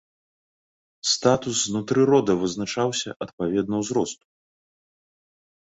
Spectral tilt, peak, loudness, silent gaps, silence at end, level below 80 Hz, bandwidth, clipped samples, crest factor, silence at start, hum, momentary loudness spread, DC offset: -4 dB/octave; -6 dBFS; -23 LUFS; 3.16-3.20 s, 3.33-3.38 s; 1.45 s; -60 dBFS; 8.4 kHz; under 0.1%; 20 dB; 1.05 s; none; 10 LU; under 0.1%